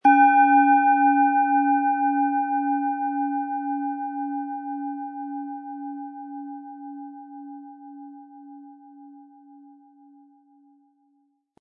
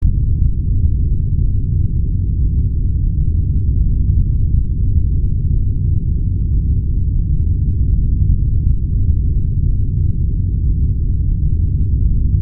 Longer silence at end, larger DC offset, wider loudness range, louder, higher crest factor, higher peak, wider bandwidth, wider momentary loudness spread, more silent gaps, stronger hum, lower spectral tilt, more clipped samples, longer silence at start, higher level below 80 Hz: first, 2.4 s vs 0 s; neither; first, 24 LU vs 1 LU; second, -22 LUFS vs -18 LUFS; first, 18 dB vs 12 dB; second, -6 dBFS vs -2 dBFS; first, 3.6 kHz vs 0.6 kHz; first, 24 LU vs 2 LU; neither; neither; second, -6 dB/octave vs -21.5 dB/octave; neither; about the same, 0.05 s vs 0 s; second, -88 dBFS vs -16 dBFS